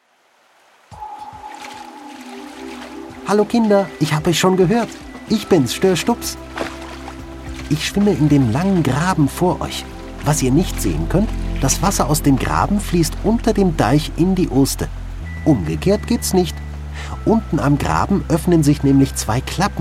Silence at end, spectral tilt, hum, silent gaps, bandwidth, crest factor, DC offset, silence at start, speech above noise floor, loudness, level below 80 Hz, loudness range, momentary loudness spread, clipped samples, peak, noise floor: 0 s; -5.5 dB/octave; none; none; 16 kHz; 16 dB; under 0.1%; 0.9 s; 40 dB; -17 LUFS; -30 dBFS; 3 LU; 18 LU; under 0.1%; -2 dBFS; -56 dBFS